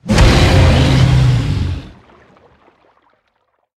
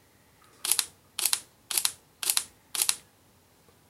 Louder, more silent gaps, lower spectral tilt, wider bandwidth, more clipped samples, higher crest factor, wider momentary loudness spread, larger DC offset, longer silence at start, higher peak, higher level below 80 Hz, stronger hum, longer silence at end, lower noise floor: first, -12 LUFS vs -28 LUFS; neither; first, -6 dB/octave vs 2.5 dB/octave; second, 12.5 kHz vs 16.5 kHz; neither; second, 14 dB vs 32 dB; first, 11 LU vs 8 LU; neither; second, 0.05 s vs 0.65 s; about the same, 0 dBFS vs -2 dBFS; first, -20 dBFS vs -74 dBFS; neither; first, 1.9 s vs 0.9 s; about the same, -64 dBFS vs -61 dBFS